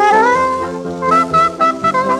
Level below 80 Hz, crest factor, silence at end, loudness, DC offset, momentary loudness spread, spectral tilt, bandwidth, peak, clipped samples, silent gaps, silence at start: -50 dBFS; 12 dB; 0 s; -13 LUFS; under 0.1%; 9 LU; -5 dB/octave; 12.5 kHz; -2 dBFS; under 0.1%; none; 0 s